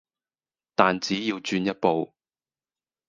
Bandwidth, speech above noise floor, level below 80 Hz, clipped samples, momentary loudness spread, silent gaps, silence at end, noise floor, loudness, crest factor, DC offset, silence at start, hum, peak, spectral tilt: 9.6 kHz; over 66 dB; -66 dBFS; under 0.1%; 8 LU; none; 1 s; under -90 dBFS; -25 LUFS; 26 dB; under 0.1%; 0.8 s; none; -2 dBFS; -5 dB/octave